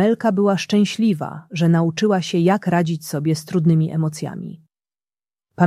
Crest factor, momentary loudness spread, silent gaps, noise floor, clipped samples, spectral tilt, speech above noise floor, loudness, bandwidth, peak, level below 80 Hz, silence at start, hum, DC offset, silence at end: 16 dB; 10 LU; none; under -90 dBFS; under 0.1%; -6.5 dB/octave; over 72 dB; -19 LUFS; 14 kHz; -2 dBFS; -62 dBFS; 0 s; none; under 0.1%; 0 s